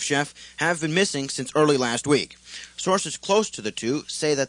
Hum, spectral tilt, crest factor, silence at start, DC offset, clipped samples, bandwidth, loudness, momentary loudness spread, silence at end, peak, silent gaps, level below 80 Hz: none; -3.5 dB/octave; 18 dB; 0 s; under 0.1%; under 0.1%; 10.5 kHz; -24 LUFS; 9 LU; 0 s; -6 dBFS; none; -62 dBFS